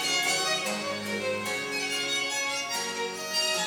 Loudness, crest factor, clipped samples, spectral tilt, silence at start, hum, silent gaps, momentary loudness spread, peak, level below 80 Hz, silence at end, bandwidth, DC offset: -28 LUFS; 14 dB; under 0.1%; -1 dB/octave; 0 s; none; none; 6 LU; -16 dBFS; -68 dBFS; 0 s; over 20 kHz; under 0.1%